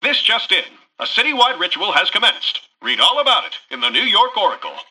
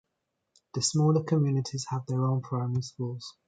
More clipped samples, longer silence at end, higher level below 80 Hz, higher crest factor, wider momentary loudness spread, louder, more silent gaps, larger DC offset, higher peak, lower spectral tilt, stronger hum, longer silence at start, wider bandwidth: neither; about the same, 0.1 s vs 0.15 s; about the same, -70 dBFS vs -66 dBFS; about the same, 16 dB vs 16 dB; about the same, 10 LU vs 11 LU; first, -15 LUFS vs -29 LUFS; neither; neither; first, -2 dBFS vs -12 dBFS; second, -0.5 dB/octave vs -6 dB/octave; neither; second, 0 s vs 0.75 s; first, 14 kHz vs 9.4 kHz